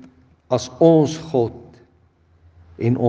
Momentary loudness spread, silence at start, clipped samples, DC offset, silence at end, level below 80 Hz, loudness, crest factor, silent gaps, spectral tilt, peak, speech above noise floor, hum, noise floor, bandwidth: 11 LU; 0.5 s; under 0.1%; under 0.1%; 0 s; -58 dBFS; -19 LUFS; 20 dB; none; -7.5 dB/octave; 0 dBFS; 40 dB; none; -57 dBFS; 8.2 kHz